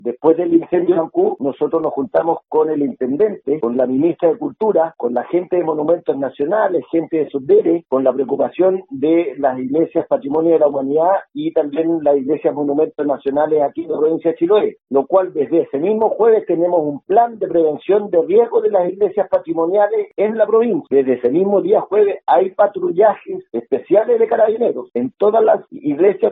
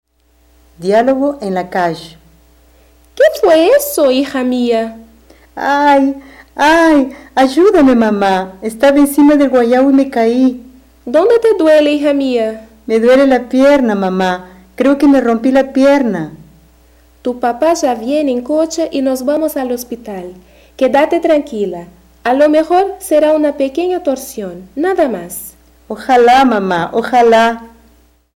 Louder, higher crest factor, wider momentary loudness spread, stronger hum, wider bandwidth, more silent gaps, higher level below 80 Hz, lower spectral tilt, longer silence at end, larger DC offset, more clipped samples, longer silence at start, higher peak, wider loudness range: second, -16 LUFS vs -12 LUFS; about the same, 14 dB vs 10 dB; second, 5 LU vs 15 LU; neither; second, 3.9 kHz vs 16.5 kHz; neither; second, -64 dBFS vs -46 dBFS; first, -11 dB/octave vs -5 dB/octave; second, 0 s vs 0.7 s; neither; neither; second, 0.05 s vs 0.8 s; about the same, 0 dBFS vs -2 dBFS; second, 2 LU vs 5 LU